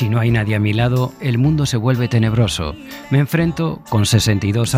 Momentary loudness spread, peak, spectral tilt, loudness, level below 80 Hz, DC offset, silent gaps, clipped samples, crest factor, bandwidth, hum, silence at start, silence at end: 4 LU; -2 dBFS; -6 dB/octave; -17 LUFS; -38 dBFS; under 0.1%; none; under 0.1%; 14 dB; 15.5 kHz; none; 0 s; 0 s